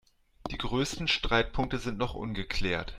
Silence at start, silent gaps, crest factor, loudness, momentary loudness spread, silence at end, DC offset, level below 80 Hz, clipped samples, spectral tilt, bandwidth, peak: 0.45 s; none; 20 dB; -31 LUFS; 10 LU; 0 s; under 0.1%; -40 dBFS; under 0.1%; -4.5 dB/octave; 13 kHz; -12 dBFS